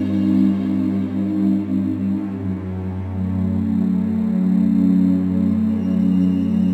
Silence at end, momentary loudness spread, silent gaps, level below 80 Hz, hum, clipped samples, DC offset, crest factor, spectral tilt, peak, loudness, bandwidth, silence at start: 0 s; 9 LU; none; -54 dBFS; none; under 0.1%; under 0.1%; 12 dB; -10.5 dB/octave; -6 dBFS; -19 LUFS; 4.4 kHz; 0 s